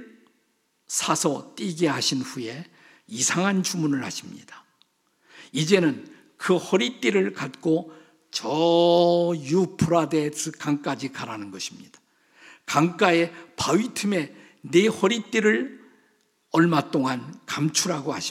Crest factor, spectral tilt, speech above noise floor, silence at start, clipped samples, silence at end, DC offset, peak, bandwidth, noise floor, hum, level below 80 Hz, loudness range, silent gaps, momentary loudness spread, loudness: 22 dB; -4.5 dB/octave; 46 dB; 0 s; under 0.1%; 0 s; under 0.1%; -4 dBFS; 15.5 kHz; -70 dBFS; none; -66 dBFS; 4 LU; none; 14 LU; -24 LUFS